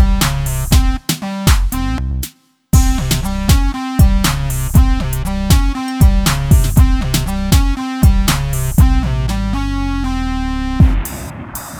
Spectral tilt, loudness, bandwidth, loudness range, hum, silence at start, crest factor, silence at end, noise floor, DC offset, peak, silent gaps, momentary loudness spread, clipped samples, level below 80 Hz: -5 dB/octave; -15 LUFS; 19.5 kHz; 3 LU; none; 0 s; 14 dB; 0 s; -33 dBFS; under 0.1%; 0 dBFS; none; 7 LU; under 0.1%; -16 dBFS